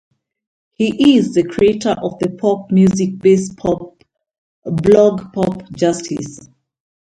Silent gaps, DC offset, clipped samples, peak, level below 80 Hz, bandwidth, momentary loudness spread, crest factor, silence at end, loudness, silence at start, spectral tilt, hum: 4.38-4.62 s; under 0.1%; under 0.1%; 0 dBFS; -48 dBFS; 10.5 kHz; 12 LU; 16 dB; 0.65 s; -15 LUFS; 0.8 s; -6.5 dB/octave; none